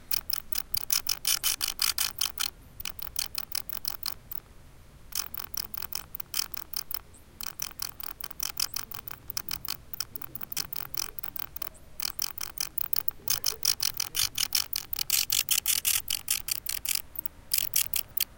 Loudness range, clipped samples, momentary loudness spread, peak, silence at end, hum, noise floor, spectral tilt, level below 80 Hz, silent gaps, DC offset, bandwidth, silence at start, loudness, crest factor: 8 LU; under 0.1%; 11 LU; -8 dBFS; 0 s; none; -51 dBFS; 1 dB/octave; -54 dBFS; none; under 0.1%; 18 kHz; 0 s; -29 LUFS; 26 dB